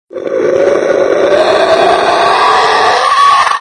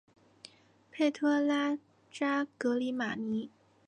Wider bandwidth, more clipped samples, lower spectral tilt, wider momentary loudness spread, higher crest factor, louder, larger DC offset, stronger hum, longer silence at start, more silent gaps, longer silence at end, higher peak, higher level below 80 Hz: about the same, 11 kHz vs 10 kHz; first, 0.3% vs under 0.1%; second, -3 dB/octave vs -5 dB/octave; second, 3 LU vs 13 LU; second, 8 dB vs 16 dB; first, -8 LUFS vs -32 LUFS; neither; neither; second, 0.15 s vs 0.95 s; neither; second, 0 s vs 0.4 s; first, 0 dBFS vs -18 dBFS; first, -46 dBFS vs -80 dBFS